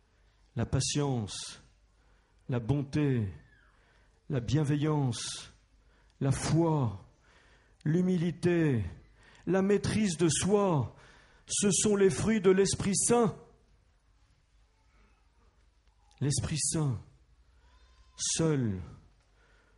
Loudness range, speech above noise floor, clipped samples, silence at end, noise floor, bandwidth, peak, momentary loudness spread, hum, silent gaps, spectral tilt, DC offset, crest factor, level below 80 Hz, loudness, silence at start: 8 LU; 37 dB; under 0.1%; 0.8 s; -66 dBFS; 11.5 kHz; -12 dBFS; 14 LU; none; none; -5 dB/octave; under 0.1%; 18 dB; -54 dBFS; -30 LUFS; 0.55 s